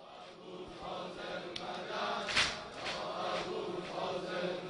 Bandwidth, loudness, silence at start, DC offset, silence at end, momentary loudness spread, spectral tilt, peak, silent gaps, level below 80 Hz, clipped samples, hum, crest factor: 10.5 kHz; -37 LUFS; 0 s; under 0.1%; 0 s; 16 LU; -3 dB/octave; -16 dBFS; none; -66 dBFS; under 0.1%; none; 24 dB